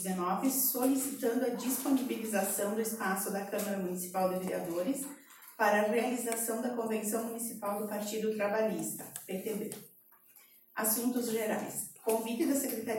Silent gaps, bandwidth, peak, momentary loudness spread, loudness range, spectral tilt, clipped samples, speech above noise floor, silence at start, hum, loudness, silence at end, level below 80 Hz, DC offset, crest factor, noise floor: none; 17 kHz; -16 dBFS; 9 LU; 4 LU; -4 dB/octave; under 0.1%; 28 dB; 0 s; none; -33 LUFS; 0 s; -80 dBFS; under 0.1%; 18 dB; -61 dBFS